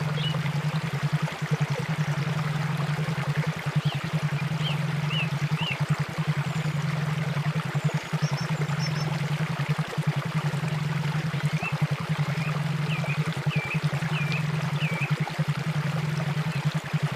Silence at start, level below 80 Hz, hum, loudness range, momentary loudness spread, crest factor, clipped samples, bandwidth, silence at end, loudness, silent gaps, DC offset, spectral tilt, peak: 0 s; -58 dBFS; none; 1 LU; 1 LU; 14 dB; under 0.1%; 15 kHz; 0 s; -28 LUFS; none; under 0.1%; -6 dB/octave; -12 dBFS